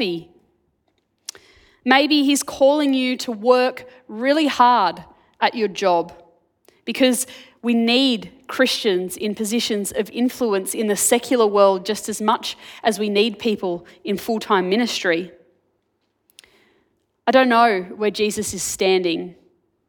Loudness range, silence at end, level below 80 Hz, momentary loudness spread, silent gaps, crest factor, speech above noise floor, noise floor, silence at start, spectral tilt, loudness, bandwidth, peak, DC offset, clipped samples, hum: 3 LU; 0.55 s; -62 dBFS; 14 LU; none; 20 dB; 51 dB; -70 dBFS; 0 s; -3 dB/octave; -19 LUFS; 19 kHz; 0 dBFS; under 0.1%; under 0.1%; none